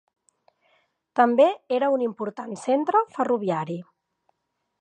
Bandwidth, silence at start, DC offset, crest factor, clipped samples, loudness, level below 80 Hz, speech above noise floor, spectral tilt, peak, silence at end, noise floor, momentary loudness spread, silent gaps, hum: 9.6 kHz; 1.15 s; under 0.1%; 20 dB; under 0.1%; -23 LUFS; -82 dBFS; 56 dB; -6.5 dB/octave; -4 dBFS; 1 s; -78 dBFS; 13 LU; none; none